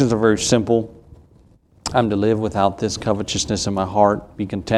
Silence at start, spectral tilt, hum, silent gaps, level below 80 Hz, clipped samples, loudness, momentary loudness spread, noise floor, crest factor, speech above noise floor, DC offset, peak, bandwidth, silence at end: 0 s; -5 dB/octave; none; none; -44 dBFS; under 0.1%; -19 LUFS; 9 LU; -52 dBFS; 18 dB; 33 dB; under 0.1%; 0 dBFS; 13 kHz; 0 s